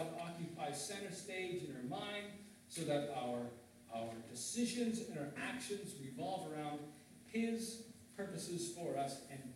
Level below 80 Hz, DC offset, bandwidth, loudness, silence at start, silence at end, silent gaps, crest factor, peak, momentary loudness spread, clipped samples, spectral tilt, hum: -82 dBFS; under 0.1%; 16 kHz; -44 LUFS; 0 s; 0 s; none; 18 dB; -26 dBFS; 10 LU; under 0.1%; -4 dB/octave; none